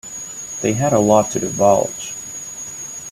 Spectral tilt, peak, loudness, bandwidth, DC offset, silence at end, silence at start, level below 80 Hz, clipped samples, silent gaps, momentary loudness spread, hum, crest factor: -5 dB/octave; 0 dBFS; -19 LUFS; 14.5 kHz; under 0.1%; 0 s; 0.05 s; -52 dBFS; under 0.1%; none; 14 LU; none; 18 dB